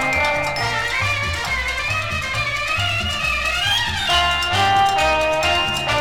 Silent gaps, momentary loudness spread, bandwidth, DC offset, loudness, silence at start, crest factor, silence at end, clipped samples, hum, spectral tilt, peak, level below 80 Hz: none; 5 LU; 18.5 kHz; under 0.1%; -18 LUFS; 0 s; 16 dB; 0 s; under 0.1%; none; -2.5 dB/octave; -2 dBFS; -36 dBFS